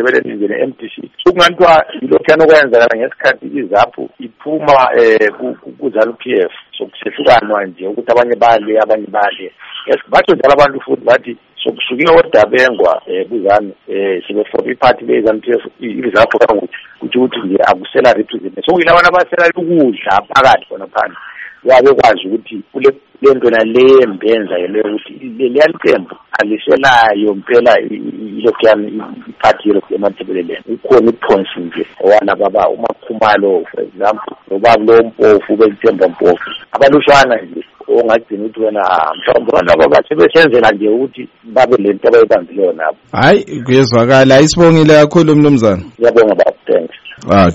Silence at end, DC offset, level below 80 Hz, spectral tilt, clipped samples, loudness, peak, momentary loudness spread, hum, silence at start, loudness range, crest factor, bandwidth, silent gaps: 0 s; under 0.1%; -44 dBFS; -5.5 dB/octave; 0.3%; -10 LUFS; 0 dBFS; 14 LU; none; 0 s; 4 LU; 10 dB; 8.6 kHz; none